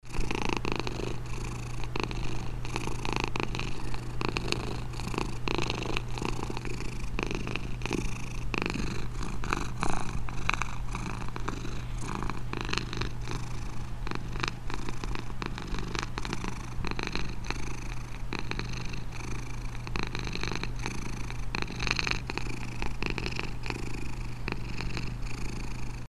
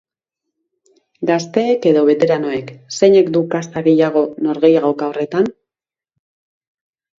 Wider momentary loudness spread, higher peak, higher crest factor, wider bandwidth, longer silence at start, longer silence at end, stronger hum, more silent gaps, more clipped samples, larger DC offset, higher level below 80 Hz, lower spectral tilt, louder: about the same, 7 LU vs 9 LU; second, -4 dBFS vs 0 dBFS; first, 26 dB vs 16 dB; first, 13 kHz vs 7.8 kHz; second, 0.05 s vs 1.2 s; second, 0 s vs 1.7 s; neither; neither; neither; neither; first, -38 dBFS vs -64 dBFS; second, -4.5 dB/octave vs -6 dB/octave; second, -35 LUFS vs -15 LUFS